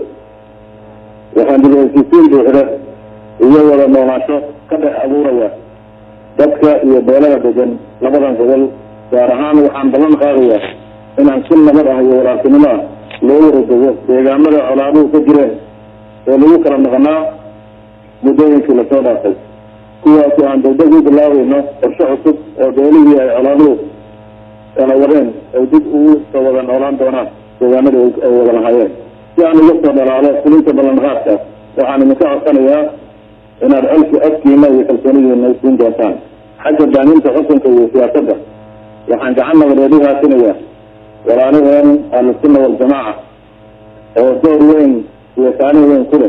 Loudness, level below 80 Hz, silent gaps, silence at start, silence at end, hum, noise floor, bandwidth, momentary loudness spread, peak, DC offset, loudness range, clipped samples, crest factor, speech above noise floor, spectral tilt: -9 LUFS; -46 dBFS; none; 0 s; 0 s; none; -39 dBFS; 4 kHz; 10 LU; 0 dBFS; under 0.1%; 3 LU; 0.7%; 8 dB; 31 dB; -9 dB/octave